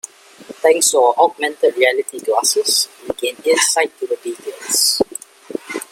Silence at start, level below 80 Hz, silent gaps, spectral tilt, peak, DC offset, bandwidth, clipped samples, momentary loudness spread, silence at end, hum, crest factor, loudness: 0.05 s; -62 dBFS; none; 0 dB/octave; 0 dBFS; under 0.1%; 16.5 kHz; under 0.1%; 15 LU; 0.05 s; none; 18 dB; -16 LUFS